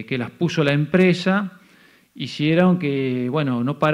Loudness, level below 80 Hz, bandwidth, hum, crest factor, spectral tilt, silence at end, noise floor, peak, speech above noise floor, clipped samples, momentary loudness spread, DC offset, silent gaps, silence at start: -20 LUFS; -60 dBFS; 10.5 kHz; none; 16 dB; -7 dB/octave; 0 s; -53 dBFS; -4 dBFS; 34 dB; under 0.1%; 10 LU; under 0.1%; none; 0 s